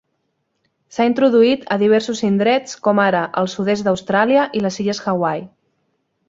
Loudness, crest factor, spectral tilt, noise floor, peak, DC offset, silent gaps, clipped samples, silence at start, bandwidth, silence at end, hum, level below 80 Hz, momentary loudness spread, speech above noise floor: -17 LUFS; 16 dB; -5.5 dB/octave; -70 dBFS; -2 dBFS; under 0.1%; none; under 0.1%; 0.95 s; 7.8 kHz; 0.8 s; none; -60 dBFS; 7 LU; 54 dB